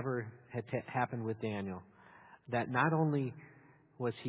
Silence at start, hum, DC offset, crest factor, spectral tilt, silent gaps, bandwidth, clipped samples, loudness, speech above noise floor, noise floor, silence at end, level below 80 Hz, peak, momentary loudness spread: 0 s; none; under 0.1%; 20 dB; -6.5 dB/octave; none; 4 kHz; under 0.1%; -36 LUFS; 24 dB; -59 dBFS; 0 s; -70 dBFS; -16 dBFS; 13 LU